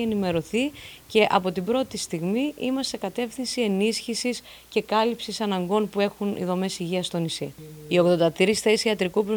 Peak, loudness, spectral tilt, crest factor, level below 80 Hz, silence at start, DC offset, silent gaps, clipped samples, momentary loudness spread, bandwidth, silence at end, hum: -4 dBFS; -25 LUFS; -4.5 dB/octave; 20 dB; -58 dBFS; 0 s; under 0.1%; none; under 0.1%; 9 LU; over 20 kHz; 0 s; none